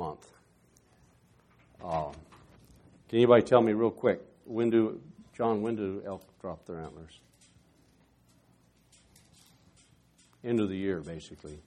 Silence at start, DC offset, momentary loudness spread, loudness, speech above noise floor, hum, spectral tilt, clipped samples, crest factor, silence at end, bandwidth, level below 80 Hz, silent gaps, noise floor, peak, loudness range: 0 s; under 0.1%; 24 LU; -29 LUFS; 36 dB; none; -7.5 dB/octave; under 0.1%; 24 dB; 0.05 s; 10.5 kHz; -64 dBFS; none; -65 dBFS; -8 dBFS; 18 LU